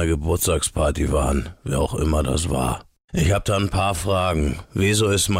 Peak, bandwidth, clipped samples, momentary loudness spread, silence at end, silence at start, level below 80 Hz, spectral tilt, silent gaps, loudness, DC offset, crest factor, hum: -10 dBFS; 16 kHz; under 0.1%; 6 LU; 0 s; 0 s; -30 dBFS; -5 dB/octave; 3.04-3.08 s; -21 LUFS; under 0.1%; 10 dB; none